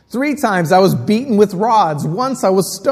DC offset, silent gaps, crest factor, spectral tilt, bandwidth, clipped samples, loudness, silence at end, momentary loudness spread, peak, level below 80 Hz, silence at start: under 0.1%; none; 14 dB; -5.5 dB/octave; 15.5 kHz; under 0.1%; -14 LUFS; 0 s; 6 LU; 0 dBFS; -54 dBFS; 0.1 s